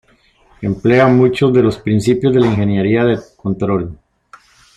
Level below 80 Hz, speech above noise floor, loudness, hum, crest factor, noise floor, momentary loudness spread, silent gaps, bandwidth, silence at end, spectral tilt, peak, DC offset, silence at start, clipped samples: -44 dBFS; 39 dB; -14 LUFS; none; 14 dB; -52 dBFS; 11 LU; none; 11 kHz; 0.8 s; -7.5 dB/octave; -2 dBFS; under 0.1%; 0.6 s; under 0.1%